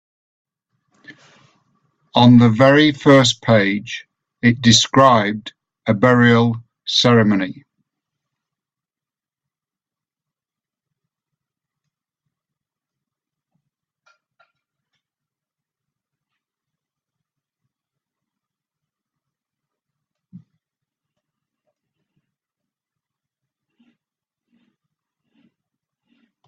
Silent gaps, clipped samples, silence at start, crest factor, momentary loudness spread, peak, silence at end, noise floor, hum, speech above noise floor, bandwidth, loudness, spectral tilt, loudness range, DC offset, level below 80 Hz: none; under 0.1%; 1.1 s; 20 dB; 15 LU; 0 dBFS; 18.95 s; under -90 dBFS; none; over 77 dB; 8.8 kHz; -14 LUFS; -5 dB/octave; 7 LU; under 0.1%; -56 dBFS